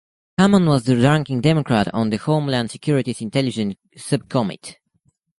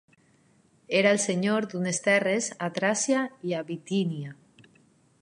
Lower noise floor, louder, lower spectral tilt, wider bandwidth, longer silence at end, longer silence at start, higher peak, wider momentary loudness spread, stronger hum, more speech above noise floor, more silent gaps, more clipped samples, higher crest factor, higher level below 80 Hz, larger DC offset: about the same, -65 dBFS vs -63 dBFS; first, -19 LUFS vs -26 LUFS; first, -6.5 dB/octave vs -4 dB/octave; about the same, 11.5 kHz vs 11.5 kHz; second, 0.65 s vs 0.9 s; second, 0.4 s vs 0.9 s; first, -2 dBFS vs -8 dBFS; about the same, 11 LU vs 9 LU; neither; first, 47 dB vs 37 dB; neither; neither; about the same, 18 dB vs 20 dB; first, -52 dBFS vs -78 dBFS; neither